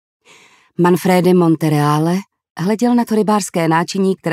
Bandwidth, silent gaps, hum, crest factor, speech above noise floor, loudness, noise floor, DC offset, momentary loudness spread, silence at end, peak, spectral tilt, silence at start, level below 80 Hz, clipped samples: 15.5 kHz; 2.51-2.55 s; none; 14 dB; 34 dB; -15 LUFS; -48 dBFS; under 0.1%; 9 LU; 0 s; 0 dBFS; -6.5 dB/octave; 0.8 s; -64 dBFS; under 0.1%